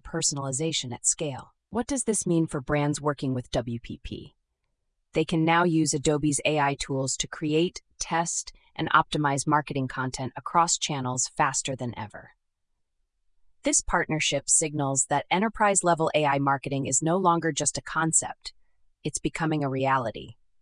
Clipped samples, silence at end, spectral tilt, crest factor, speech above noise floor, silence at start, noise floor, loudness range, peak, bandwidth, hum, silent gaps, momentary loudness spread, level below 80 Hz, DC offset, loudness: under 0.1%; 0.3 s; -3.5 dB/octave; 22 dB; 51 dB; 0.05 s; -77 dBFS; 5 LU; -4 dBFS; 11 kHz; none; none; 12 LU; -52 dBFS; under 0.1%; -26 LUFS